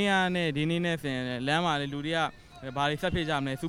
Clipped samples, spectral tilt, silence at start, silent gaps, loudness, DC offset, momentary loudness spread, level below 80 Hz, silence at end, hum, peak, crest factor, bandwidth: under 0.1%; -5.5 dB/octave; 0 s; none; -29 LUFS; under 0.1%; 6 LU; -52 dBFS; 0 s; none; -12 dBFS; 16 dB; 15.5 kHz